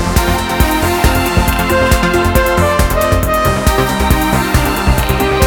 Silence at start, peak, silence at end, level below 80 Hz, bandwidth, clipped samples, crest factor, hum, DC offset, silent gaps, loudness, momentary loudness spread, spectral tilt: 0 s; 0 dBFS; 0 s; -18 dBFS; over 20 kHz; under 0.1%; 12 dB; none; under 0.1%; none; -12 LUFS; 2 LU; -5 dB/octave